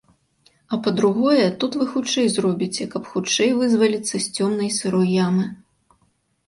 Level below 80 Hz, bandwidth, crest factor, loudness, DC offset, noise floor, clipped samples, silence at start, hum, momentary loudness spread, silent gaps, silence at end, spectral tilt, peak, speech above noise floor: -64 dBFS; 11.5 kHz; 16 dB; -20 LUFS; under 0.1%; -65 dBFS; under 0.1%; 0.7 s; none; 7 LU; none; 0.9 s; -4.5 dB/octave; -6 dBFS; 45 dB